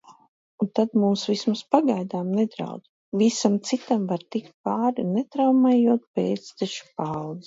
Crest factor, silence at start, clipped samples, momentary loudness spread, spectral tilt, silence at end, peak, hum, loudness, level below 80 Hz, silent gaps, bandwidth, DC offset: 20 dB; 0.1 s; under 0.1%; 11 LU; -6 dB/octave; 0.05 s; -4 dBFS; none; -24 LUFS; -70 dBFS; 0.28-0.58 s, 2.89-3.12 s, 4.54-4.64 s, 6.07-6.14 s; 7.8 kHz; under 0.1%